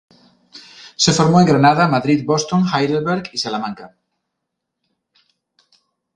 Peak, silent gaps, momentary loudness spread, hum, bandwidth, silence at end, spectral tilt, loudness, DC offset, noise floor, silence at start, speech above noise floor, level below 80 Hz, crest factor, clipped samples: 0 dBFS; none; 16 LU; none; 10 kHz; 2.3 s; -5 dB/octave; -16 LUFS; under 0.1%; -78 dBFS; 0.55 s; 62 dB; -54 dBFS; 18 dB; under 0.1%